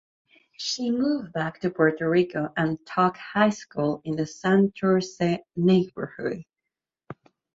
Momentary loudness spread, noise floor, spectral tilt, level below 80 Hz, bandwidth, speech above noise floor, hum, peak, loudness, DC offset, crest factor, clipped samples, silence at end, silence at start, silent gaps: 10 LU; -86 dBFS; -6 dB/octave; -64 dBFS; 7.8 kHz; 62 dB; none; -4 dBFS; -25 LUFS; under 0.1%; 20 dB; under 0.1%; 0.4 s; 0.6 s; none